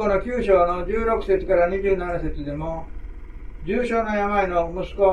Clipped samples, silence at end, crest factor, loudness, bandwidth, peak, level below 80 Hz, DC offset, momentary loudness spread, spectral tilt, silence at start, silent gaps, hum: under 0.1%; 0 s; 18 dB; -22 LUFS; 9.6 kHz; -4 dBFS; -34 dBFS; under 0.1%; 19 LU; -7.5 dB/octave; 0 s; none; none